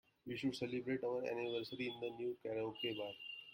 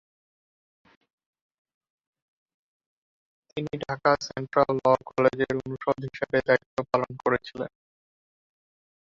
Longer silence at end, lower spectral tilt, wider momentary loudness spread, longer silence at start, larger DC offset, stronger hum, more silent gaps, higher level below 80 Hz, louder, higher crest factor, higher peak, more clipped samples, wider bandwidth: second, 0 s vs 1.5 s; about the same, -5.5 dB/octave vs -6 dB/octave; second, 5 LU vs 12 LU; second, 0.25 s vs 3.55 s; neither; neither; second, none vs 6.66-6.77 s; second, -80 dBFS vs -60 dBFS; second, -43 LUFS vs -26 LUFS; second, 14 dB vs 22 dB; second, -28 dBFS vs -6 dBFS; neither; first, 16.5 kHz vs 7.4 kHz